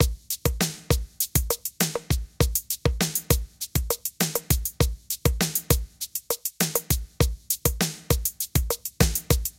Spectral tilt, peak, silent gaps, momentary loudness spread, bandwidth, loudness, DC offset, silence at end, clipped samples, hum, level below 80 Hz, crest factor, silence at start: -3.5 dB/octave; -4 dBFS; none; 5 LU; 17 kHz; -26 LUFS; under 0.1%; 0.1 s; under 0.1%; none; -32 dBFS; 22 dB; 0 s